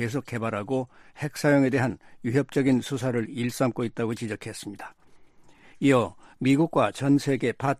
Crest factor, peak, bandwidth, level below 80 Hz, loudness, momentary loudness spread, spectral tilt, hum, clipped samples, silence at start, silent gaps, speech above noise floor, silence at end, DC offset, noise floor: 18 dB; -8 dBFS; 14.5 kHz; -62 dBFS; -26 LUFS; 13 LU; -6.5 dB/octave; none; under 0.1%; 0 s; none; 27 dB; 0 s; under 0.1%; -52 dBFS